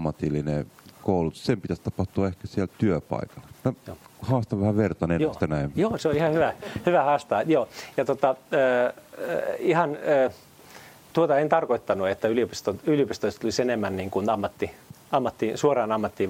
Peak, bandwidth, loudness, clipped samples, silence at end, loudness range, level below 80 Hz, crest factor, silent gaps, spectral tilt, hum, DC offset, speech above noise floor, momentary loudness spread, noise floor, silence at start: -6 dBFS; 16.5 kHz; -25 LUFS; under 0.1%; 0 s; 4 LU; -54 dBFS; 20 dB; none; -6.5 dB/octave; none; under 0.1%; 23 dB; 8 LU; -48 dBFS; 0 s